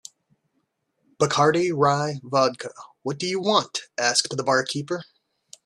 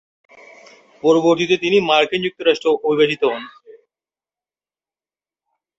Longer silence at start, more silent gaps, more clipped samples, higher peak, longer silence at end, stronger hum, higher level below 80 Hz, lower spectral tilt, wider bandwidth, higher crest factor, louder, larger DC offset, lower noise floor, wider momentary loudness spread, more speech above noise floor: first, 1.2 s vs 1.05 s; neither; neither; about the same, -4 dBFS vs -2 dBFS; second, 0.6 s vs 2.3 s; neither; about the same, -66 dBFS vs -64 dBFS; second, -3.5 dB/octave vs -5 dB/octave; first, 12.5 kHz vs 8 kHz; about the same, 22 dB vs 18 dB; second, -23 LUFS vs -17 LUFS; neither; second, -74 dBFS vs under -90 dBFS; first, 13 LU vs 7 LU; second, 51 dB vs over 74 dB